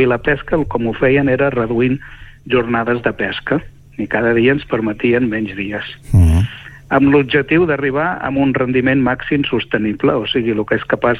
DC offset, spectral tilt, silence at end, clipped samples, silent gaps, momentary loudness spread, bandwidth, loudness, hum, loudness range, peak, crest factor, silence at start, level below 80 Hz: under 0.1%; -8 dB/octave; 0 s; under 0.1%; none; 8 LU; 11.5 kHz; -16 LUFS; none; 2 LU; -2 dBFS; 14 dB; 0 s; -32 dBFS